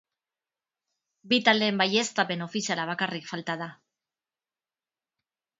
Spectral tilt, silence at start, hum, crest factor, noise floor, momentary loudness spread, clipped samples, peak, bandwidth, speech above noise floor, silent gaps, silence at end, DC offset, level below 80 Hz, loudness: -3.5 dB/octave; 1.25 s; none; 26 dB; under -90 dBFS; 12 LU; under 0.1%; -4 dBFS; 8 kHz; over 63 dB; none; 1.85 s; under 0.1%; -78 dBFS; -26 LUFS